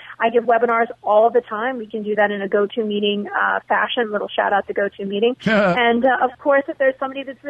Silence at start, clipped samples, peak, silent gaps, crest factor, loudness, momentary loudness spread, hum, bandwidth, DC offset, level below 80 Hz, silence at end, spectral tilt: 0 s; under 0.1%; -6 dBFS; none; 14 dB; -19 LUFS; 8 LU; none; 8 kHz; under 0.1%; -60 dBFS; 0 s; -6.5 dB/octave